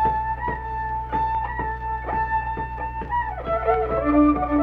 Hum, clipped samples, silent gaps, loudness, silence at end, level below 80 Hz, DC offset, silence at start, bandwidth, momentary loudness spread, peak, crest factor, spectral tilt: none; under 0.1%; none; -24 LUFS; 0 s; -34 dBFS; under 0.1%; 0 s; 4.7 kHz; 10 LU; -8 dBFS; 16 dB; -9.5 dB/octave